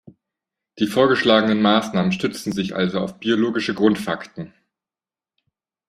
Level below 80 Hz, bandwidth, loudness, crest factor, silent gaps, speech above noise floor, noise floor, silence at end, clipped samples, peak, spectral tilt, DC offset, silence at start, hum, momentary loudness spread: -58 dBFS; 14.5 kHz; -20 LUFS; 20 dB; none; over 71 dB; under -90 dBFS; 1.4 s; under 0.1%; -2 dBFS; -5.5 dB/octave; under 0.1%; 0.75 s; none; 12 LU